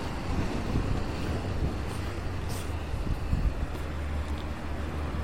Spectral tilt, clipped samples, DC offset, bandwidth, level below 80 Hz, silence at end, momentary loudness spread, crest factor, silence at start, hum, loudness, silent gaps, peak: -6.5 dB/octave; under 0.1%; 0.9%; 16 kHz; -34 dBFS; 0 s; 4 LU; 18 dB; 0 s; none; -33 LUFS; none; -12 dBFS